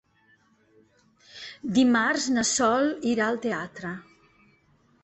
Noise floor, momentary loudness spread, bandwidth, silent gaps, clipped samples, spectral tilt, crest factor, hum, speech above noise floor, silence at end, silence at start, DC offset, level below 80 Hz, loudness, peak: -63 dBFS; 17 LU; 8.4 kHz; none; under 0.1%; -3 dB/octave; 18 dB; none; 39 dB; 1 s; 1.35 s; under 0.1%; -64 dBFS; -24 LUFS; -10 dBFS